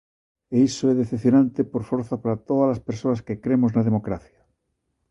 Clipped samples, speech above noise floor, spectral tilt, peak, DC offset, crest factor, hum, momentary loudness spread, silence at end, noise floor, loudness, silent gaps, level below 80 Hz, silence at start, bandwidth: under 0.1%; 53 dB; -7.5 dB/octave; -8 dBFS; under 0.1%; 16 dB; none; 8 LU; 0.9 s; -75 dBFS; -22 LUFS; none; -54 dBFS; 0.5 s; 8.2 kHz